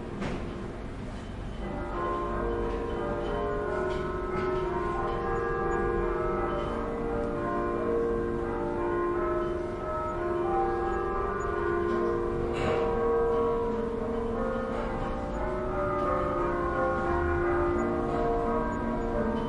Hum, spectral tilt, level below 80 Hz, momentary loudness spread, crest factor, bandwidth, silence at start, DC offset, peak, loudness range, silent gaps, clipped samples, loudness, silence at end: none; -7.5 dB/octave; -40 dBFS; 6 LU; 14 dB; 11 kHz; 0 s; under 0.1%; -16 dBFS; 3 LU; none; under 0.1%; -30 LUFS; 0 s